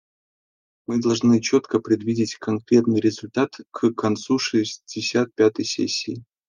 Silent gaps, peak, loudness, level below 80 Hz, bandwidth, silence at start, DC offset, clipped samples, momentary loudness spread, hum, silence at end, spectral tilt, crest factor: none; -4 dBFS; -22 LUFS; -66 dBFS; 9.8 kHz; 0.9 s; under 0.1%; under 0.1%; 8 LU; none; 0.25 s; -5 dB/octave; 18 dB